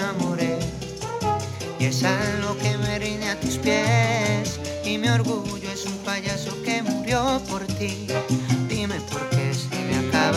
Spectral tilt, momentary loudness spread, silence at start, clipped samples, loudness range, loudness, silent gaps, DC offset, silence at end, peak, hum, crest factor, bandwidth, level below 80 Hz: -5 dB/octave; 7 LU; 0 s; under 0.1%; 2 LU; -24 LUFS; none; under 0.1%; 0 s; -8 dBFS; none; 16 dB; 15.5 kHz; -46 dBFS